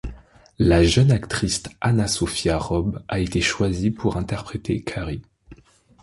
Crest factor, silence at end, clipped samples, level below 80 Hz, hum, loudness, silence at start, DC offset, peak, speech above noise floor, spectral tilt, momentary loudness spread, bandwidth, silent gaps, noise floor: 18 dB; 0.5 s; under 0.1%; -34 dBFS; none; -22 LUFS; 0.05 s; under 0.1%; -4 dBFS; 30 dB; -5.5 dB/octave; 12 LU; 11.5 kHz; none; -51 dBFS